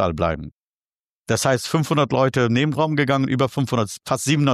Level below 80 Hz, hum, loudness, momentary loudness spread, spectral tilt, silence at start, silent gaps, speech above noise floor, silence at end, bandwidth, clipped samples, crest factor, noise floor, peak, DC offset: -46 dBFS; none; -20 LUFS; 6 LU; -5.5 dB/octave; 0 s; 0.56-0.82 s, 0.95-1.25 s; over 70 dB; 0 s; 14 kHz; under 0.1%; 16 dB; under -90 dBFS; -4 dBFS; under 0.1%